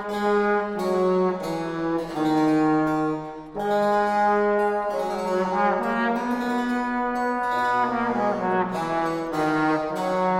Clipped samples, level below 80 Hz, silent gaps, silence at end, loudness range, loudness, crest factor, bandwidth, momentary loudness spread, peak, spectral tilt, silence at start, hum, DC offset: under 0.1%; -54 dBFS; none; 0 s; 1 LU; -23 LUFS; 12 dB; 15.5 kHz; 6 LU; -10 dBFS; -6.5 dB/octave; 0 s; none; under 0.1%